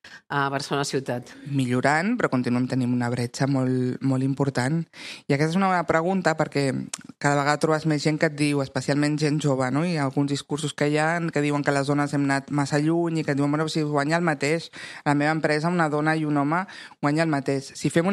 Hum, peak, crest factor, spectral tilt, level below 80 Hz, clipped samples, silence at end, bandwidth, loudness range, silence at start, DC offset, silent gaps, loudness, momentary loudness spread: none; -4 dBFS; 20 dB; -6 dB/octave; -64 dBFS; under 0.1%; 0 s; 12.5 kHz; 1 LU; 0.05 s; under 0.1%; none; -24 LUFS; 5 LU